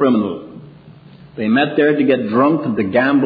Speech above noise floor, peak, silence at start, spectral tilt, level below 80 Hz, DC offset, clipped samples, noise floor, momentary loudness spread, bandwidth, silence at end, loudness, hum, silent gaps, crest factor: 26 dB; -2 dBFS; 0 s; -9.5 dB/octave; -58 dBFS; under 0.1%; under 0.1%; -41 dBFS; 15 LU; 4.9 kHz; 0 s; -16 LUFS; none; none; 14 dB